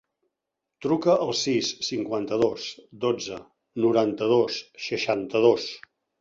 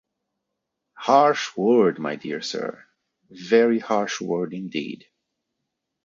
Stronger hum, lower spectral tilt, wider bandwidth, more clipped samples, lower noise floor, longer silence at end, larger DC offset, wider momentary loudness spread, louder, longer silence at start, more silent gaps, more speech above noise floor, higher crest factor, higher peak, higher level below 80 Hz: neither; about the same, -4.5 dB/octave vs -5 dB/octave; about the same, 7.8 kHz vs 7.6 kHz; neither; first, -85 dBFS vs -81 dBFS; second, 0.4 s vs 1.1 s; neither; about the same, 14 LU vs 14 LU; second, -25 LUFS vs -22 LUFS; second, 0.8 s vs 1 s; neither; about the same, 60 dB vs 59 dB; about the same, 20 dB vs 20 dB; about the same, -6 dBFS vs -4 dBFS; first, -66 dBFS vs -74 dBFS